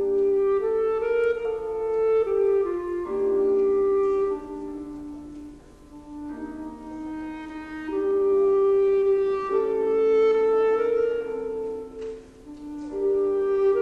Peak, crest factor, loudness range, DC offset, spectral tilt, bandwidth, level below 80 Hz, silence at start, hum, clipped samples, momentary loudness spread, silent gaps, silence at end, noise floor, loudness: -14 dBFS; 10 dB; 11 LU; under 0.1%; -7 dB/octave; 5.6 kHz; -52 dBFS; 0 s; none; under 0.1%; 17 LU; none; 0 s; -46 dBFS; -23 LUFS